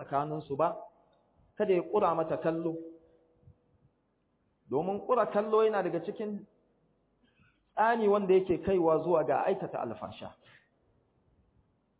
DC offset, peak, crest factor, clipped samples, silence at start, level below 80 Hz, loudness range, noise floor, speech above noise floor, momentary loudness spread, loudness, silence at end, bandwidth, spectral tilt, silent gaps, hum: under 0.1%; -14 dBFS; 18 dB; under 0.1%; 0 s; -66 dBFS; 5 LU; -75 dBFS; 45 dB; 15 LU; -30 LUFS; 1.65 s; 4 kHz; -6 dB/octave; none; none